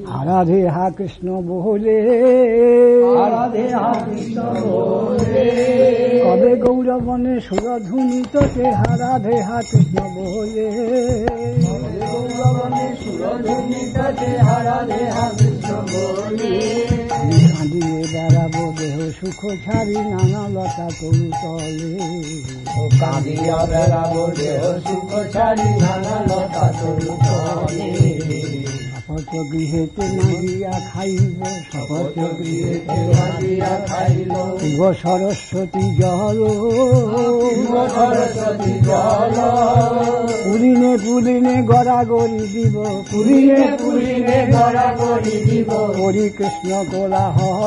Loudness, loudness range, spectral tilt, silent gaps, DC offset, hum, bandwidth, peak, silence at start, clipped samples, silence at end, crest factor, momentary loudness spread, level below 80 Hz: -17 LUFS; 6 LU; -7 dB/octave; none; under 0.1%; none; 10.5 kHz; -2 dBFS; 0 s; under 0.1%; 0 s; 14 dB; 10 LU; -40 dBFS